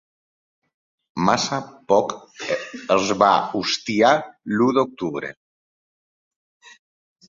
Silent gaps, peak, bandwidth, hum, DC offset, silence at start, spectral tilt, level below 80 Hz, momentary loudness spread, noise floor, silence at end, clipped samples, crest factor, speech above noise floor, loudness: none; -2 dBFS; 7.6 kHz; none; under 0.1%; 1.15 s; -4 dB/octave; -60 dBFS; 12 LU; under -90 dBFS; 1.95 s; under 0.1%; 20 dB; over 69 dB; -21 LUFS